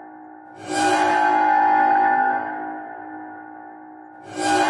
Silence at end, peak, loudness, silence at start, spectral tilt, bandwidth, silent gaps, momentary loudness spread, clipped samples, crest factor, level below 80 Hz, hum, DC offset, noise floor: 0 s; -6 dBFS; -19 LUFS; 0 s; -3 dB/octave; 11.5 kHz; none; 23 LU; under 0.1%; 14 dB; -68 dBFS; none; under 0.1%; -41 dBFS